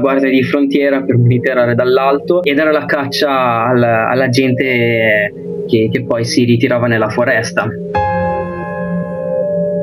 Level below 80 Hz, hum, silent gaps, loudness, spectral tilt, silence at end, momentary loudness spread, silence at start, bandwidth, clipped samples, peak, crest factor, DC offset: -46 dBFS; none; none; -13 LUFS; -6.5 dB/octave; 0 s; 7 LU; 0 s; 15 kHz; under 0.1%; 0 dBFS; 12 dB; under 0.1%